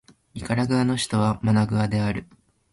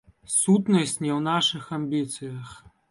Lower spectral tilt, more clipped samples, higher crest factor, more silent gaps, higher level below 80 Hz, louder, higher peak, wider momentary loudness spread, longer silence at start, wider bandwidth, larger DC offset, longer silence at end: first, -6 dB/octave vs -4 dB/octave; neither; about the same, 16 dB vs 16 dB; neither; first, -48 dBFS vs -64 dBFS; about the same, -23 LUFS vs -24 LUFS; about the same, -8 dBFS vs -10 dBFS; second, 12 LU vs 16 LU; about the same, 0.35 s vs 0.3 s; about the same, 11.5 kHz vs 11.5 kHz; neither; first, 0.5 s vs 0.35 s